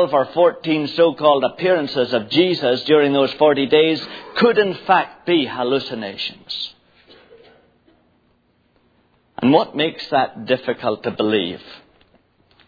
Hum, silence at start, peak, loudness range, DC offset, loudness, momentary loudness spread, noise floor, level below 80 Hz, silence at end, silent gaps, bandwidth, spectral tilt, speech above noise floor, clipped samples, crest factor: none; 0 s; 0 dBFS; 11 LU; under 0.1%; -18 LUFS; 11 LU; -61 dBFS; -64 dBFS; 0.9 s; none; 5 kHz; -7 dB/octave; 43 dB; under 0.1%; 20 dB